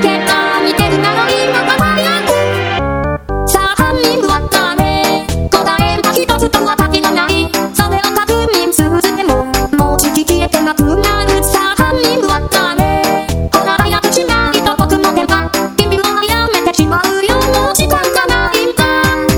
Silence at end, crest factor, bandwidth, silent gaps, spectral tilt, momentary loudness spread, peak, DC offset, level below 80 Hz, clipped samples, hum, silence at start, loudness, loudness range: 0 s; 12 dB; over 20 kHz; none; -4 dB/octave; 2 LU; 0 dBFS; under 0.1%; -24 dBFS; 0.3%; none; 0 s; -11 LUFS; 1 LU